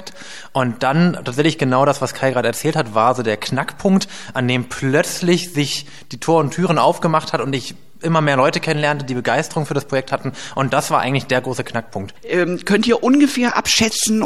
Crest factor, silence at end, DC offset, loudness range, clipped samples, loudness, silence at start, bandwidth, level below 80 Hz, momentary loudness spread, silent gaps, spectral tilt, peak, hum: 16 dB; 0 s; 1%; 2 LU; under 0.1%; -18 LUFS; 0 s; 15 kHz; -54 dBFS; 10 LU; none; -4.5 dB/octave; -2 dBFS; none